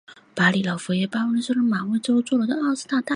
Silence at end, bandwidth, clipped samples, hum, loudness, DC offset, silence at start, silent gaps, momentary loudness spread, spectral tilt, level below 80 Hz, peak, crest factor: 0 s; 11 kHz; under 0.1%; none; -22 LUFS; under 0.1%; 0.1 s; none; 5 LU; -5.5 dB/octave; -68 dBFS; -4 dBFS; 18 dB